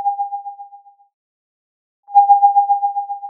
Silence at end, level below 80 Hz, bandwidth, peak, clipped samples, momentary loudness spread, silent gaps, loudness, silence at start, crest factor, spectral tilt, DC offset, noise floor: 0 s; under -90 dBFS; 2.6 kHz; -2 dBFS; under 0.1%; 16 LU; 1.14-2.03 s; -15 LUFS; 0 s; 16 dB; -3 dB/octave; under 0.1%; -44 dBFS